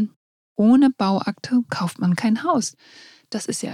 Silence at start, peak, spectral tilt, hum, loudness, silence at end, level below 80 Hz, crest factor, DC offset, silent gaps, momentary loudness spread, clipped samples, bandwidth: 0 s; -6 dBFS; -5.5 dB/octave; none; -21 LUFS; 0 s; -68 dBFS; 16 dB; under 0.1%; 0.16-0.56 s; 14 LU; under 0.1%; 14.5 kHz